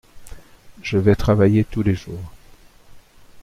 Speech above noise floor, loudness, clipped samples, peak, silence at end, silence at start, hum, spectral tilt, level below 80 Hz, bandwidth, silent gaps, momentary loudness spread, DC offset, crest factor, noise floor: 29 dB; -18 LUFS; under 0.1%; -2 dBFS; 0 s; 0.15 s; none; -8 dB/octave; -38 dBFS; 13 kHz; none; 19 LU; under 0.1%; 18 dB; -47 dBFS